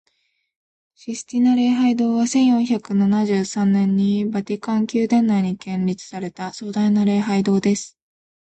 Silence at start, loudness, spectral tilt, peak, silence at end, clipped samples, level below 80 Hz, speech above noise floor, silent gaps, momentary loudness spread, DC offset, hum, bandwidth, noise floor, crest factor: 1.05 s; -19 LUFS; -6.5 dB/octave; -8 dBFS; 0.65 s; under 0.1%; -60 dBFS; 49 dB; none; 12 LU; under 0.1%; none; 8.8 kHz; -68 dBFS; 12 dB